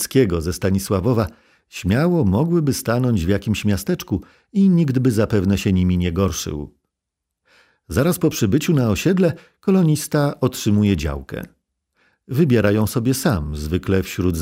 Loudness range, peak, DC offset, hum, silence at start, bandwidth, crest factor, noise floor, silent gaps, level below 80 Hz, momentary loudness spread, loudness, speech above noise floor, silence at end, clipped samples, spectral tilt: 3 LU; -2 dBFS; under 0.1%; none; 0 s; 16 kHz; 16 dB; -81 dBFS; none; -38 dBFS; 10 LU; -19 LUFS; 63 dB; 0 s; under 0.1%; -6.5 dB/octave